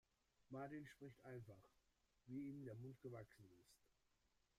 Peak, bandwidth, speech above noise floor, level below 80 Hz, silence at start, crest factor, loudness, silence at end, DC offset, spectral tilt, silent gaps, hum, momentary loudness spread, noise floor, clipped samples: -42 dBFS; 15 kHz; 28 dB; -84 dBFS; 0.4 s; 18 dB; -57 LUFS; 0.75 s; under 0.1%; -7.5 dB/octave; none; none; 8 LU; -85 dBFS; under 0.1%